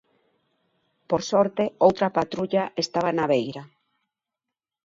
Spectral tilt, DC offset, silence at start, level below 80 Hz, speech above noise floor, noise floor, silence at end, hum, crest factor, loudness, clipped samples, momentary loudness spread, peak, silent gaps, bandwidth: -5.5 dB/octave; under 0.1%; 1.1 s; -64 dBFS; 64 dB; -87 dBFS; 1.2 s; none; 22 dB; -24 LUFS; under 0.1%; 7 LU; -4 dBFS; none; 7.8 kHz